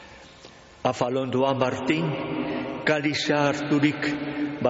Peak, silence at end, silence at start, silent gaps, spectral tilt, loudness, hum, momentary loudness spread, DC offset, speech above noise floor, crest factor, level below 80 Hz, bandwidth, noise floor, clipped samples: -8 dBFS; 0 s; 0 s; none; -4.5 dB/octave; -25 LUFS; none; 6 LU; under 0.1%; 24 dB; 18 dB; -58 dBFS; 8 kHz; -48 dBFS; under 0.1%